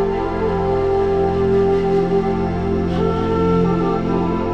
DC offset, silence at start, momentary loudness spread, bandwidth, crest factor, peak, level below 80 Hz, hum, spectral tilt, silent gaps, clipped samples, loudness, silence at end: under 0.1%; 0 s; 4 LU; 7.4 kHz; 12 dB; -4 dBFS; -32 dBFS; none; -9 dB/octave; none; under 0.1%; -18 LUFS; 0 s